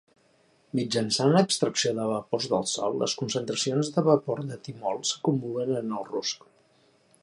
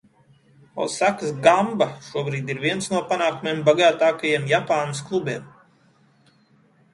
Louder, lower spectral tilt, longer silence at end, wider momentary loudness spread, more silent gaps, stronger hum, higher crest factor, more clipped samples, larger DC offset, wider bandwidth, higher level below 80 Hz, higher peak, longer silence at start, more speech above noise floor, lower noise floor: second, -27 LUFS vs -21 LUFS; about the same, -4.5 dB/octave vs -4.5 dB/octave; second, 0.85 s vs 1.45 s; about the same, 10 LU vs 11 LU; neither; neither; about the same, 22 dB vs 22 dB; neither; neither; about the same, 11.5 kHz vs 11.5 kHz; about the same, -70 dBFS vs -66 dBFS; second, -6 dBFS vs 0 dBFS; about the same, 0.75 s vs 0.75 s; about the same, 37 dB vs 37 dB; first, -64 dBFS vs -58 dBFS